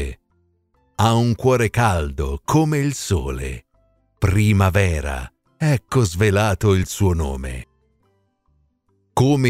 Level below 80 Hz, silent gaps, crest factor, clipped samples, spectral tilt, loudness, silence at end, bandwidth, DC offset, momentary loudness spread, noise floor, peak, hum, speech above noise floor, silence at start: -34 dBFS; none; 16 dB; under 0.1%; -6 dB/octave; -19 LUFS; 0 s; 15.5 kHz; under 0.1%; 14 LU; -65 dBFS; -4 dBFS; none; 47 dB; 0 s